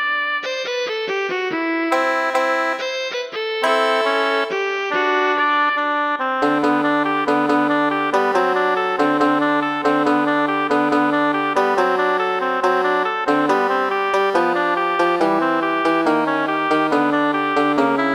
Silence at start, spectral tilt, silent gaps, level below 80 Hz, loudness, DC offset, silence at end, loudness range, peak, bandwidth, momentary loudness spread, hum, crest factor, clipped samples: 0 s; -4.5 dB/octave; none; -68 dBFS; -18 LUFS; under 0.1%; 0 s; 2 LU; -4 dBFS; 18.5 kHz; 4 LU; none; 14 dB; under 0.1%